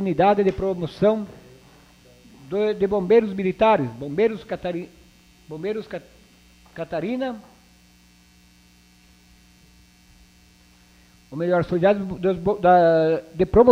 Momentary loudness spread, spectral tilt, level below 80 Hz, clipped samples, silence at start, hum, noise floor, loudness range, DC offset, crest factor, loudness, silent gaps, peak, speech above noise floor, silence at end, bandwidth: 19 LU; -8 dB/octave; -48 dBFS; under 0.1%; 0 s; 60 Hz at -55 dBFS; -54 dBFS; 13 LU; under 0.1%; 20 dB; -21 LUFS; none; -2 dBFS; 34 dB; 0 s; 12 kHz